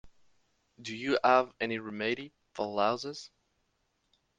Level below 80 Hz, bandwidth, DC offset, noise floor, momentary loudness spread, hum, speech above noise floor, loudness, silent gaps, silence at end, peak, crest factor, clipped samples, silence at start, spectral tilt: -72 dBFS; 9.4 kHz; under 0.1%; -77 dBFS; 18 LU; none; 46 dB; -31 LUFS; none; 1.1 s; -12 dBFS; 22 dB; under 0.1%; 0.05 s; -4.5 dB/octave